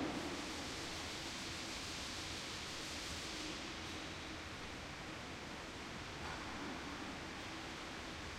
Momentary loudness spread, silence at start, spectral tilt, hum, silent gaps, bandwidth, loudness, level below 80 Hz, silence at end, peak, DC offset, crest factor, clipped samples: 4 LU; 0 s; -3 dB/octave; none; none; 16 kHz; -45 LUFS; -60 dBFS; 0 s; -30 dBFS; under 0.1%; 16 dB; under 0.1%